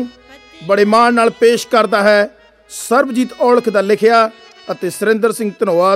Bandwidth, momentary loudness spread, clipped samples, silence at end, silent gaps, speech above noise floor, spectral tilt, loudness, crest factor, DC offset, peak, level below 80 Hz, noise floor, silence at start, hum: 15.5 kHz; 12 LU; under 0.1%; 0 s; none; 28 dB; -4.5 dB/octave; -13 LUFS; 14 dB; under 0.1%; 0 dBFS; -60 dBFS; -41 dBFS; 0 s; none